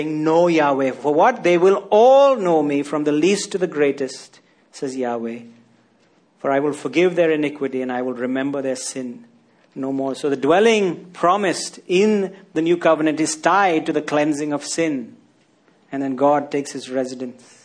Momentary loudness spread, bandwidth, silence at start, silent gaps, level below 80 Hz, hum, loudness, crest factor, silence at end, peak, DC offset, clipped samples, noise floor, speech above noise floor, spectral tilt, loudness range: 13 LU; 10.5 kHz; 0 s; none; -72 dBFS; none; -19 LUFS; 18 dB; 0.3 s; -2 dBFS; under 0.1%; under 0.1%; -58 dBFS; 39 dB; -4.5 dB/octave; 7 LU